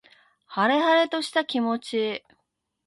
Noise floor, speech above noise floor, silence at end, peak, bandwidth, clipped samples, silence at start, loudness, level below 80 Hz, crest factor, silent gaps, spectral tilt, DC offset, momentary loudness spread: -77 dBFS; 53 dB; 0.7 s; -10 dBFS; 11.5 kHz; under 0.1%; 0.5 s; -24 LUFS; -76 dBFS; 16 dB; none; -4 dB/octave; under 0.1%; 11 LU